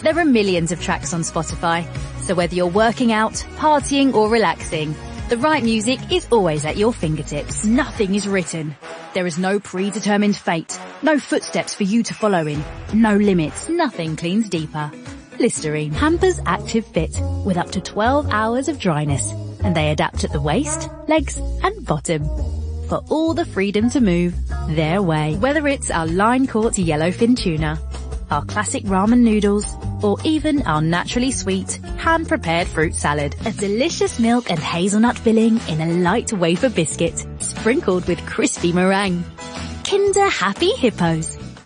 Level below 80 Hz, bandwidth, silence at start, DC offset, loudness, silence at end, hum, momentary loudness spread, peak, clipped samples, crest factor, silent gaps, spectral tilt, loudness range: -34 dBFS; 10.5 kHz; 0 s; under 0.1%; -19 LUFS; 0.05 s; none; 8 LU; -4 dBFS; under 0.1%; 16 dB; none; -5 dB/octave; 3 LU